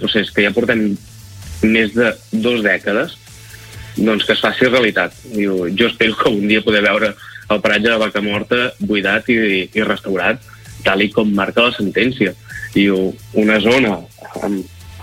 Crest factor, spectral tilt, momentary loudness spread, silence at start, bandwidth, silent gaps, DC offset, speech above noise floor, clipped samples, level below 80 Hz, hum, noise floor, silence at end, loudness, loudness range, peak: 16 dB; -5.5 dB/octave; 12 LU; 0 s; 16 kHz; none; under 0.1%; 21 dB; under 0.1%; -44 dBFS; none; -37 dBFS; 0 s; -15 LUFS; 2 LU; -2 dBFS